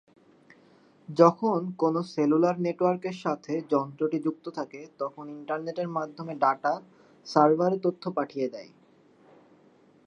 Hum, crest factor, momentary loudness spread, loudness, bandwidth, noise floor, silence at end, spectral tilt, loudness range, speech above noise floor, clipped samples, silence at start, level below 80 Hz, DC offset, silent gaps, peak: none; 24 dB; 15 LU; -27 LUFS; 8.8 kHz; -59 dBFS; 1.4 s; -7.5 dB/octave; 6 LU; 33 dB; under 0.1%; 1.1 s; -82 dBFS; under 0.1%; none; -4 dBFS